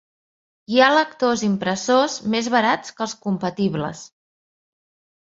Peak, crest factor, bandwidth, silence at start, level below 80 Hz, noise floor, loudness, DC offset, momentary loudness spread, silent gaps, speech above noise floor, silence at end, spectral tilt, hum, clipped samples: -2 dBFS; 20 dB; 7.8 kHz; 0.7 s; -62 dBFS; under -90 dBFS; -20 LUFS; under 0.1%; 12 LU; none; over 70 dB; 1.25 s; -4.5 dB/octave; none; under 0.1%